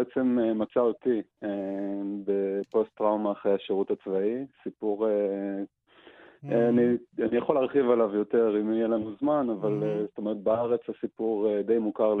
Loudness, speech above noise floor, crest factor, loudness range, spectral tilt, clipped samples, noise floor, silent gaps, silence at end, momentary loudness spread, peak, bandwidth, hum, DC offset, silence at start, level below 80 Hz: -27 LUFS; 28 dB; 16 dB; 3 LU; -10 dB/octave; under 0.1%; -54 dBFS; none; 0 s; 8 LU; -10 dBFS; 4.1 kHz; none; under 0.1%; 0 s; -70 dBFS